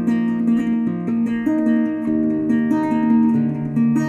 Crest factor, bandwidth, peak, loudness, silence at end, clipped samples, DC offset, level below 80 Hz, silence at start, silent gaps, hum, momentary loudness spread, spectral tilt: 12 dB; 7.2 kHz; -6 dBFS; -19 LUFS; 0 s; under 0.1%; under 0.1%; -56 dBFS; 0 s; none; none; 5 LU; -8.5 dB/octave